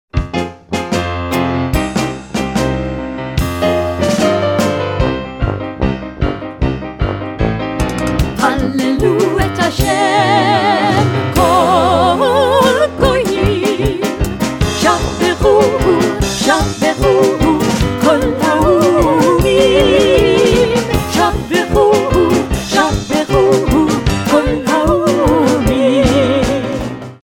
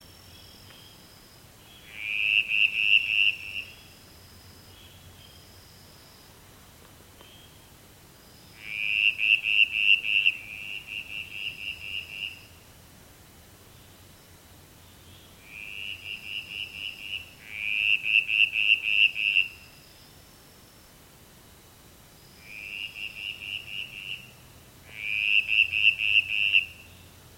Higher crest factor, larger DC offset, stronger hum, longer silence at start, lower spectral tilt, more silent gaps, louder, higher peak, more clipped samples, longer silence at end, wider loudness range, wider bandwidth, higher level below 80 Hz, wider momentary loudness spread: second, 12 dB vs 22 dB; neither; neither; about the same, 0.15 s vs 0.05 s; first, -5.5 dB/octave vs -0.5 dB/octave; neither; first, -13 LUFS vs -24 LUFS; first, 0 dBFS vs -8 dBFS; neither; second, 0.1 s vs 0.3 s; second, 6 LU vs 17 LU; first, over 20 kHz vs 16.5 kHz; first, -26 dBFS vs -62 dBFS; second, 9 LU vs 17 LU